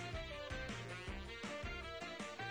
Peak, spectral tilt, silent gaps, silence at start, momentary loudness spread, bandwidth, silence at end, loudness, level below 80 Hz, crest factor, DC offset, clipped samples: -34 dBFS; -4.5 dB/octave; none; 0 s; 2 LU; over 20 kHz; 0 s; -46 LUFS; -54 dBFS; 12 dB; under 0.1%; under 0.1%